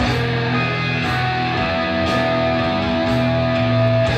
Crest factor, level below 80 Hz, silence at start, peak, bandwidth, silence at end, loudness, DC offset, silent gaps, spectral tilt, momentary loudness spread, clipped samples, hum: 12 dB; -36 dBFS; 0 s; -6 dBFS; 9.2 kHz; 0 s; -18 LUFS; under 0.1%; none; -6.5 dB/octave; 2 LU; under 0.1%; none